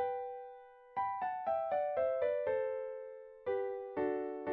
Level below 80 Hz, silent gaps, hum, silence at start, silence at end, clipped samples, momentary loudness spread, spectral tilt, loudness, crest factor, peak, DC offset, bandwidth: -74 dBFS; none; none; 0 s; 0 s; under 0.1%; 13 LU; -4.5 dB/octave; -37 LUFS; 14 dB; -24 dBFS; under 0.1%; 4.4 kHz